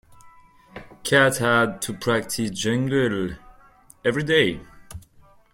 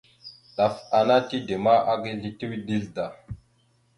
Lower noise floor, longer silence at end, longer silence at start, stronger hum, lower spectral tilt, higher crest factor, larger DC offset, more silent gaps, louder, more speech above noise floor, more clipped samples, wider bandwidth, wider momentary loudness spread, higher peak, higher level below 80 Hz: second, -53 dBFS vs -64 dBFS; about the same, 0.55 s vs 0.6 s; about the same, 0.25 s vs 0.25 s; neither; second, -4.5 dB/octave vs -6.5 dB/octave; about the same, 20 dB vs 18 dB; neither; neither; first, -22 LUFS vs -25 LUFS; second, 32 dB vs 41 dB; neither; first, 16.5 kHz vs 11 kHz; first, 25 LU vs 22 LU; about the same, -4 dBFS vs -6 dBFS; first, -52 dBFS vs -58 dBFS